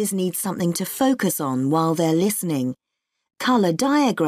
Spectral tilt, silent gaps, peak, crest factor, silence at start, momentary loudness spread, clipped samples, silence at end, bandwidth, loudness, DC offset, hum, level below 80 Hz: -5 dB/octave; none; -8 dBFS; 14 dB; 0 s; 6 LU; under 0.1%; 0 s; 15.5 kHz; -21 LUFS; under 0.1%; none; -64 dBFS